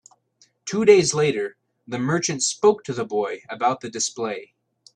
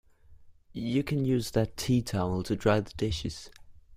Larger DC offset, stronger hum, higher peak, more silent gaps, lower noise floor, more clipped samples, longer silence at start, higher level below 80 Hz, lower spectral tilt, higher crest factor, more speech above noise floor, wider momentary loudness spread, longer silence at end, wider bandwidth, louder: neither; neither; first, -2 dBFS vs -10 dBFS; neither; first, -61 dBFS vs -53 dBFS; neither; first, 0.65 s vs 0.3 s; second, -64 dBFS vs -48 dBFS; second, -4 dB/octave vs -6 dB/octave; about the same, 20 dB vs 20 dB; first, 40 dB vs 25 dB; about the same, 14 LU vs 12 LU; first, 0.5 s vs 0 s; second, 10.5 kHz vs 16 kHz; first, -22 LUFS vs -30 LUFS